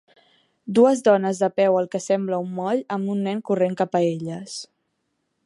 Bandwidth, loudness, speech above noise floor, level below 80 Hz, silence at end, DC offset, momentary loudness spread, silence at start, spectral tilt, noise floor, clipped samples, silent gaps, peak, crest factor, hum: 11.5 kHz; -22 LUFS; 53 dB; -72 dBFS; 0.8 s; under 0.1%; 13 LU; 0.65 s; -6 dB/octave; -74 dBFS; under 0.1%; none; -4 dBFS; 18 dB; none